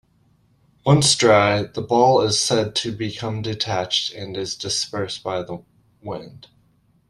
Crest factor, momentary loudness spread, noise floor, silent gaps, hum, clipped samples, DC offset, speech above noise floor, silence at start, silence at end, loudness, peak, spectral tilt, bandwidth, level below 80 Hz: 20 dB; 18 LU; -60 dBFS; none; none; under 0.1%; under 0.1%; 40 dB; 0.85 s; 0.7 s; -20 LUFS; -2 dBFS; -4 dB/octave; 13 kHz; -56 dBFS